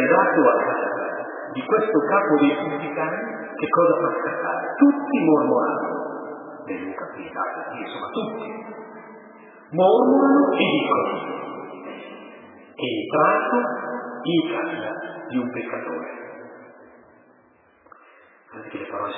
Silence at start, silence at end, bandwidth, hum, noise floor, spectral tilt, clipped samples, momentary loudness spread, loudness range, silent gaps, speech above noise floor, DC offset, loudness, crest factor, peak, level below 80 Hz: 0 s; 0 s; 4 kHz; none; -57 dBFS; -10 dB/octave; under 0.1%; 19 LU; 11 LU; none; 35 dB; under 0.1%; -22 LUFS; 20 dB; -4 dBFS; -78 dBFS